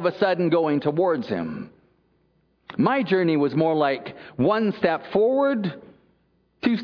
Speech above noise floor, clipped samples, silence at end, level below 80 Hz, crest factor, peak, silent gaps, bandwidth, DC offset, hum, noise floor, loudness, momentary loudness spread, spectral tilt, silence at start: 43 dB; under 0.1%; 0 s; -64 dBFS; 18 dB; -6 dBFS; none; 5.4 kHz; under 0.1%; none; -65 dBFS; -23 LUFS; 12 LU; -9 dB/octave; 0 s